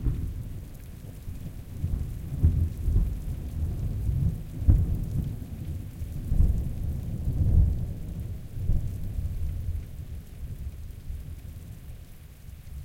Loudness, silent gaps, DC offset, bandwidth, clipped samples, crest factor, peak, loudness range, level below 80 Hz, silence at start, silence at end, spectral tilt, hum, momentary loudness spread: -31 LUFS; none; under 0.1%; 16.5 kHz; under 0.1%; 20 dB; -8 dBFS; 9 LU; -32 dBFS; 0 s; 0 s; -8.5 dB/octave; none; 18 LU